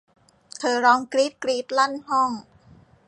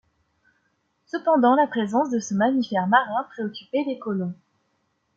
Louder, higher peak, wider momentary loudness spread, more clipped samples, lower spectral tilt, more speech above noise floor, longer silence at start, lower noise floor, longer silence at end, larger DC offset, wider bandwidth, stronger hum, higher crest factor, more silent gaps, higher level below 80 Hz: about the same, -22 LUFS vs -23 LUFS; about the same, -6 dBFS vs -4 dBFS; about the same, 10 LU vs 12 LU; neither; second, -2.5 dB/octave vs -5.5 dB/octave; second, 31 dB vs 49 dB; second, 0.6 s vs 1.15 s; second, -53 dBFS vs -71 dBFS; second, 0.65 s vs 0.85 s; neither; first, 11 kHz vs 7.8 kHz; neither; about the same, 18 dB vs 20 dB; neither; about the same, -68 dBFS vs -72 dBFS